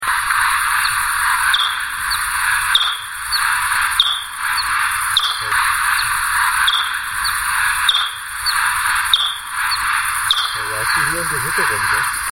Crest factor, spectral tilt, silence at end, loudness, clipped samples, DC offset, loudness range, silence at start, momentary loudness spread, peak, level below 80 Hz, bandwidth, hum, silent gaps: 18 dB; 1 dB/octave; 0 s; -16 LUFS; under 0.1%; under 0.1%; 1 LU; 0 s; 5 LU; 0 dBFS; -44 dBFS; 16.5 kHz; none; none